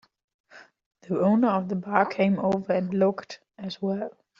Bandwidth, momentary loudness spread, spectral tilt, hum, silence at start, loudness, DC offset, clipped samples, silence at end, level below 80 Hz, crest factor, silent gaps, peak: 7.2 kHz; 15 LU; -6.5 dB/octave; none; 0.55 s; -25 LUFS; under 0.1%; under 0.1%; 0.3 s; -68 dBFS; 22 dB; 0.86-0.91 s; -4 dBFS